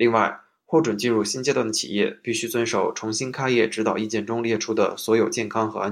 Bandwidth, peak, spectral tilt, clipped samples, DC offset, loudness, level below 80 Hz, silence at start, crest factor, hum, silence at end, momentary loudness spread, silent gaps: 15 kHz; -4 dBFS; -4 dB/octave; under 0.1%; under 0.1%; -23 LUFS; -68 dBFS; 0 s; 18 dB; none; 0 s; 5 LU; none